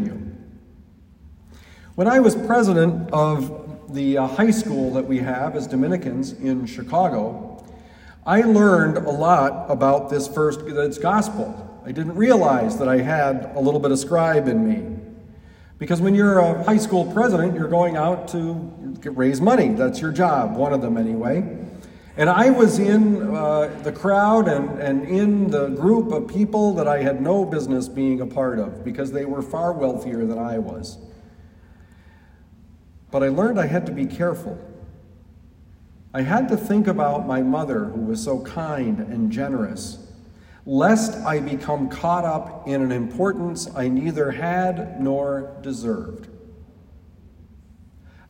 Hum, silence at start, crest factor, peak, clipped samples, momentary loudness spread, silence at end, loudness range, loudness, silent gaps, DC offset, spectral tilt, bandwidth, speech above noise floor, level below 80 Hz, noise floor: none; 0 s; 20 dB; -2 dBFS; under 0.1%; 13 LU; 0.2 s; 7 LU; -20 LUFS; none; under 0.1%; -7 dB/octave; 16 kHz; 29 dB; -52 dBFS; -49 dBFS